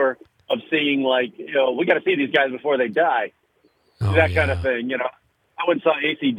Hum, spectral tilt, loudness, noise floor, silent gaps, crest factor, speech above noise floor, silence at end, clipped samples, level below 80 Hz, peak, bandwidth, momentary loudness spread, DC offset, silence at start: none; -7 dB/octave; -21 LUFS; -62 dBFS; none; 18 dB; 42 dB; 0 s; under 0.1%; -54 dBFS; -2 dBFS; 10.5 kHz; 8 LU; under 0.1%; 0 s